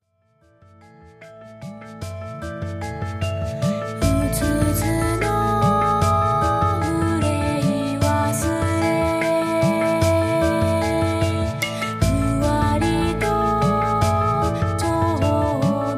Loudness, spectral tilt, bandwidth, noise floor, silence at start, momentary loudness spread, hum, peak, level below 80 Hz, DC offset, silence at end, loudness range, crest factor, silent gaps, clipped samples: -20 LUFS; -6 dB/octave; 15.5 kHz; -60 dBFS; 1.05 s; 10 LU; none; -6 dBFS; -34 dBFS; under 0.1%; 0 s; 6 LU; 14 dB; none; under 0.1%